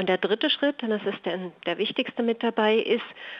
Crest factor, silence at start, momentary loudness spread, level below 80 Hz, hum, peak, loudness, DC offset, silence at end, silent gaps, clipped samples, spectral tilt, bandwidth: 16 dB; 0 s; 9 LU; -80 dBFS; none; -10 dBFS; -26 LUFS; under 0.1%; 0 s; none; under 0.1%; -7 dB/octave; 6 kHz